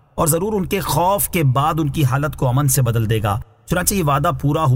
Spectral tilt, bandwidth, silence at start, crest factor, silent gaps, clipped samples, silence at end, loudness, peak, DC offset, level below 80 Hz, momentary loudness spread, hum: -5.5 dB/octave; 16.5 kHz; 0.15 s; 16 dB; none; under 0.1%; 0 s; -18 LUFS; -2 dBFS; under 0.1%; -36 dBFS; 4 LU; none